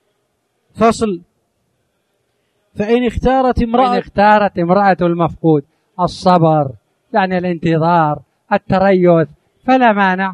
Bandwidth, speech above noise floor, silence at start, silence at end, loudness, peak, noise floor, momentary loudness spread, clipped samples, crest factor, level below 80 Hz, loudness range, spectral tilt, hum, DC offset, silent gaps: 10.5 kHz; 53 dB; 0.75 s; 0 s; -14 LUFS; 0 dBFS; -66 dBFS; 10 LU; under 0.1%; 14 dB; -36 dBFS; 4 LU; -7 dB/octave; none; under 0.1%; none